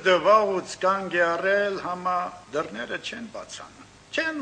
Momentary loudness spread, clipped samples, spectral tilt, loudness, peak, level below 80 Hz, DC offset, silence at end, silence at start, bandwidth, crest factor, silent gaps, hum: 18 LU; under 0.1%; -4 dB/octave; -25 LUFS; -6 dBFS; -64 dBFS; under 0.1%; 0 s; 0 s; 9.8 kHz; 18 dB; none; 50 Hz at -60 dBFS